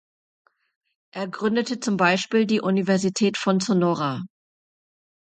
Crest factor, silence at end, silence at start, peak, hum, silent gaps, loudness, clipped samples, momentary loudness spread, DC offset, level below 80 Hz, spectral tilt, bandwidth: 20 dB; 0.95 s; 1.15 s; -4 dBFS; none; none; -22 LUFS; under 0.1%; 12 LU; under 0.1%; -70 dBFS; -5 dB/octave; 9.2 kHz